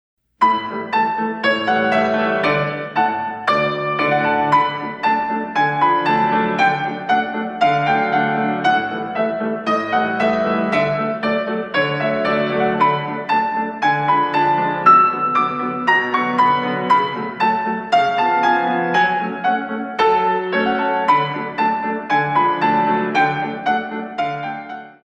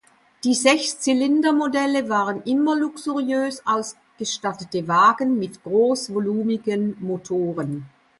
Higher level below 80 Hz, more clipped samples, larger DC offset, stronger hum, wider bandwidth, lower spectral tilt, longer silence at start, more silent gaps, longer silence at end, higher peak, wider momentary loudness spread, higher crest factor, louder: first, -58 dBFS vs -68 dBFS; neither; neither; neither; second, 9.4 kHz vs 11.5 kHz; first, -6 dB/octave vs -4 dB/octave; about the same, 0.4 s vs 0.45 s; neither; second, 0.15 s vs 0.3 s; about the same, -2 dBFS vs -2 dBFS; second, 6 LU vs 10 LU; about the same, 16 dB vs 20 dB; first, -18 LUFS vs -21 LUFS